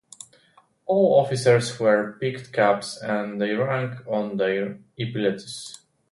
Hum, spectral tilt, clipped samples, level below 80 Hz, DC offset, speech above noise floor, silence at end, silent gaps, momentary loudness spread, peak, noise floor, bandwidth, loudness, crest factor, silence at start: none; -5.5 dB/octave; under 0.1%; -66 dBFS; under 0.1%; 36 dB; 0.4 s; none; 15 LU; -6 dBFS; -59 dBFS; 11.5 kHz; -23 LUFS; 18 dB; 0.85 s